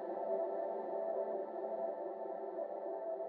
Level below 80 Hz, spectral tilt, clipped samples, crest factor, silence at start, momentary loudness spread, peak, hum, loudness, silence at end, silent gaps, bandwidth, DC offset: under -90 dBFS; -6 dB/octave; under 0.1%; 14 dB; 0 s; 5 LU; -26 dBFS; none; -41 LUFS; 0 s; none; 4.4 kHz; under 0.1%